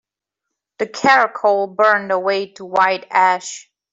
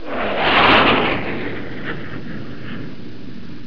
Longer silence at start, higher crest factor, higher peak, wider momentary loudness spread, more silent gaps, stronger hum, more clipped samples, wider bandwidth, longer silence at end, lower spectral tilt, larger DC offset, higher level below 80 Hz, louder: first, 0.8 s vs 0 s; about the same, 16 dB vs 18 dB; about the same, -2 dBFS vs -2 dBFS; second, 12 LU vs 24 LU; neither; neither; neither; first, 8 kHz vs 5.4 kHz; first, 0.3 s vs 0 s; second, -3 dB/octave vs -6 dB/octave; second, under 0.1% vs 5%; second, -68 dBFS vs -40 dBFS; about the same, -16 LUFS vs -16 LUFS